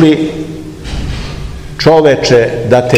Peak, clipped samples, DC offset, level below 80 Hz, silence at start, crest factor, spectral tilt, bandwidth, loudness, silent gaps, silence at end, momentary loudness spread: 0 dBFS; 2%; under 0.1%; -26 dBFS; 0 s; 10 dB; -6 dB/octave; 14 kHz; -10 LUFS; none; 0 s; 17 LU